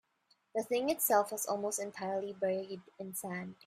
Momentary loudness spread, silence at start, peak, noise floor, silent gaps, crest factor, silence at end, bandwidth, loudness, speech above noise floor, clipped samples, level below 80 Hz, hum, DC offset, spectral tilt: 12 LU; 0.55 s; -14 dBFS; -74 dBFS; none; 22 dB; 0.15 s; 16 kHz; -35 LUFS; 39 dB; under 0.1%; -78 dBFS; none; under 0.1%; -3.5 dB/octave